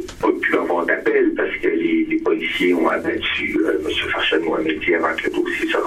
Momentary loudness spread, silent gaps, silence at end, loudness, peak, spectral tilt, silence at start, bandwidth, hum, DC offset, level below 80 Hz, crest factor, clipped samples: 3 LU; none; 0 s; -19 LUFS; -4 dBFS; -4.5 dB/octave; 0 s; 14 kHz; none; under 0.1%; -46 dBFS; 16 dB; under 0.1%